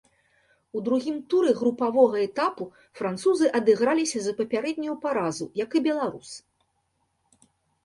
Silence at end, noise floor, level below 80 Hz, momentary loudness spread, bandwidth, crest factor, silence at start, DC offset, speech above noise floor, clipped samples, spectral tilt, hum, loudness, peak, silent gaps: 1.45 s; -73 dBFS; -70 dBFS; 12 LU; 11.5 kHz; 20 dB; 0.75 s; under 0.1%; 49 dB; under 0.1%; -4.5 dB/octave; none; -25 LUFS; -6 dBFS; none